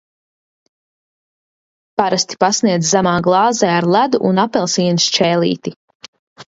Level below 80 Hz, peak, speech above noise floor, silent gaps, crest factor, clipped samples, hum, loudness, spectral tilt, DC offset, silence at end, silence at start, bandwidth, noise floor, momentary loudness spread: -58 dBFS; 0 dBFS; over 76 dB; 5.76-5.88 s, 5.95-6.00 s, 6.08-6.13 s, 6.19-6.36 s; 16 dB; under 0.1%; none; -15 LUFS; -4 dB/octave; under 0.1%; 0.05 s; 2 s; 7.8 kHz; under -90 dBFS; 6 LU